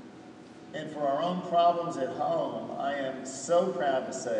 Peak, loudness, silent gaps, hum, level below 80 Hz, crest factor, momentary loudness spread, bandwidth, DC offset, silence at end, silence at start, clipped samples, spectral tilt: -14 dBFS; -30 LUFS; none; none; -76 dBFS; 16 dB; 17 LU; 10 kHz; under 0.1%; 0 s; 0 s; under 0.1%; -4.5 dB/octave